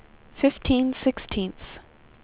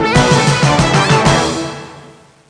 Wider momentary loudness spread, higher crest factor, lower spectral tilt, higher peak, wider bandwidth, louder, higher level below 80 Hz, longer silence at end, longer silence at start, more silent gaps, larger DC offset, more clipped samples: first, 16 LU vs 12 LU; first, 20 dB vs 12 dB; first, -10.5 dB/octave vs -4.5 dB/octave; second, -8 dBFS vs 0 dBFS; second, 4 kHz vs 10.5 kHz; second, -25 LUFS vs -11 LUFS; second, -42 dBFS vs -32 dBFS; about the same, 0.45 s vs 0.45 s; first, 0.35 s vs 0 s; neither; neither; neither